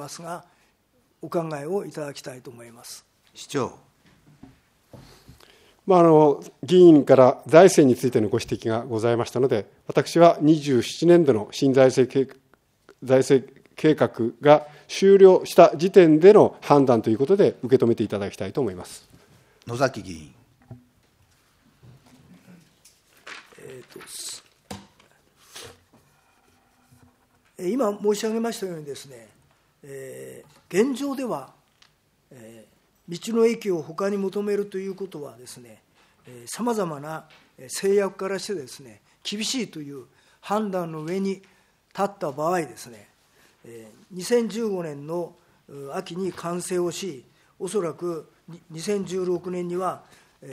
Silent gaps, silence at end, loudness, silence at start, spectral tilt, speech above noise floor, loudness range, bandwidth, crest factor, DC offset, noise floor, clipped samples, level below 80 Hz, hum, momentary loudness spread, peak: none; 0 s; -21 LUFS; 0 s; -6 dB/octave; 44 dB; 18 LU; 15.5 kHz; 22 dB; under 0.1%; -65 dBFS; under 0.1%; -66 dBFS; none; 26 LU; 0 dBFS